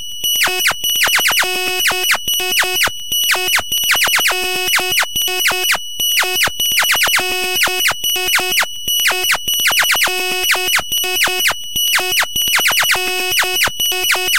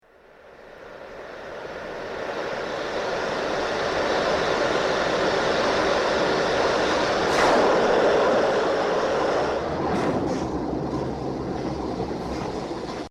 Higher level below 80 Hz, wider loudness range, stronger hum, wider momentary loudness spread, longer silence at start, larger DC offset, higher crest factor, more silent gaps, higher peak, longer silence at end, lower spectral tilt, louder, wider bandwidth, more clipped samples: about the same, -46 dBFS vs -46 dBFS; second, 0 LU vs 8 LU; neither; second, 4 LU vs 14 LU; second, 0 s vs 0.45 s; first, 3% vs under 0.1%; about the same, 16 dB vs 16 dB; neither; first, 0 dBFS vs -8 dBFS; about the same, 0 s vs 0 s; second, 1 dB/octave vs -4.5 dB/octave; first, -13 LUFS vs -24 LUFS; first, 17 kHz vs 13.5 kHz; neither